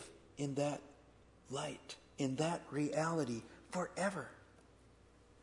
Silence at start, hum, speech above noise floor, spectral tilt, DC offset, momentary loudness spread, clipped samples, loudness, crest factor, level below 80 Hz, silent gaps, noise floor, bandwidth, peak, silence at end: 0 s; none; 25 dB; -5.5 dB/octave; under 0.1%; 16 LU; under 0.1%; -41 LUFS; 20 dB; -70 dBFS; none; -65 dBFS; 11 kHz; -22 dBFS; 1 s